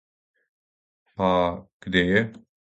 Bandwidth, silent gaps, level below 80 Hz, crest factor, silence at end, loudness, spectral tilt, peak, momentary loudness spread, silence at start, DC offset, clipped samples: 8.2 kHz; 1.73-1.80 s; -50 dBFS; 22 dB; 0.35 s; -23 LUFS; -6.5 dB/octave; -6 dBFS; 15 LU; 1.2 s; under 0.1%; under 0.1%